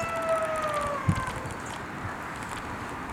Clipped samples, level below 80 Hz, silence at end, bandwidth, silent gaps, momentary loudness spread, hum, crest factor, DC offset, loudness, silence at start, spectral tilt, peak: under 0.1%; -50 dBFS; 0 s; 17.5 kHz; none; 8 LU; none; 20 dB; under 0.1%; -31 LUFS; 0 s; -5.5 dB/octave; -12 dBFS